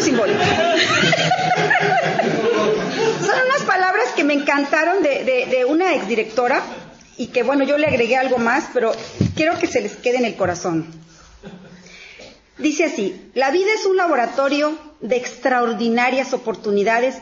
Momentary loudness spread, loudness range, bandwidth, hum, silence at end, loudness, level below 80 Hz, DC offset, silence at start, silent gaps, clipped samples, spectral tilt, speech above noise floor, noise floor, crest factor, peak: 7 LU; 6 LU; 7.8 kHz; none; 0 s; -18 LUFS; -56 dBFS; under 0.1%; 0 s; none; under 0.1%; -4.5 dB/octave; 24 dB; -43 dBFS; 18 dB; -2 dBFS